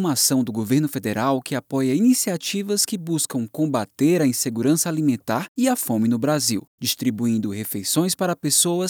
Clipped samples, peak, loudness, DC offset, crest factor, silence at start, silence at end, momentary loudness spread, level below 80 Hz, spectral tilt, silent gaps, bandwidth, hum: under 0.1%; -4 dBFS; -21 LUFS; under 0.1%; 16 dB; 0 s; 0 s; 7 LU; -74 dBFS; -4 dB/octave; 5.48-5.55 s, 6.68-6.78 s; over 20 kHz; none